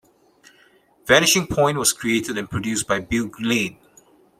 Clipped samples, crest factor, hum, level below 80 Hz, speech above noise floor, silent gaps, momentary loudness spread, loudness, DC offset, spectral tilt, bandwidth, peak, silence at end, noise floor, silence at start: under 0.1%; 20 dB; none; -48 dBFS; 36 dB; none; 11 LU; -20 LUFS; under 0.1%; -3 dB/octave; 16 kHz; -2 dBFS; 0.65 s; -56 dBFS; 1.05 s